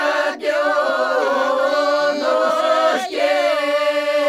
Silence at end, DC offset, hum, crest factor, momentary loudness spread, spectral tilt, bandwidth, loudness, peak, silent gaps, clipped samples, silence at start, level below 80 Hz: 0 s; under 0.1%; none; 12 dB; 2 LU; -1.5 dB/octave; 14 kHz; -18 LUFS; -4 dBFS; none; under 0.1%; 0 s; -74 dBFS